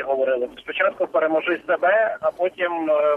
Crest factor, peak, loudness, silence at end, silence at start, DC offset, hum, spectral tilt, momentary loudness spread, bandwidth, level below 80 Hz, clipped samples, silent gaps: 14 dB; -8 dBFS; -21 LUFS; 0 s; 0 s; under 0.1%; none; -5.5 dB/octave; 5 LU; 4.2 kHz; -66 dBFS; under 0.1%; none